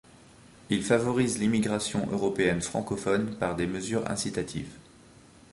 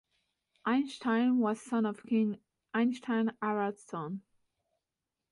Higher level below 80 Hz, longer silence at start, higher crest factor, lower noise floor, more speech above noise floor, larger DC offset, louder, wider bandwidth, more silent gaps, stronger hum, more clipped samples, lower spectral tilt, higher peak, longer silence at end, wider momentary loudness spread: first, -54 dBFS vs -80 dBFS; second, 0.45 s vs 0.65 s; about the same, 20 dB vs 16 dB; second, -54 dBFS vs -89 dBFS; second, 26 dB vs 58 dB; neither; first, -28 LUFS vs -32 LUFS; about the same, 11.5 kHz vs 11.5 kHz; neither; neither; neither; second, -5 dB/octave vs -6.5 dB/octave; first, -8 dBFS vs -18 dBFS; second, 0.7 s vs 1.1 s; second, 6 LU vs 11 LU